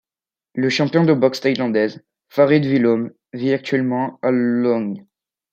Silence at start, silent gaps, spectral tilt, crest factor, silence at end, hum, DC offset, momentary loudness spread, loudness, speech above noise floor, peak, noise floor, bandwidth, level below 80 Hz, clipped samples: 0.55 s; none; -7 dB/octave; 16 dB; 0.5 s; none; under 0.1%; 10 LU; -18 LUFS; over 72 dB; -2 dBFS; under -90 dBFS; 15 kHz; -68 dBFS; under 0.1%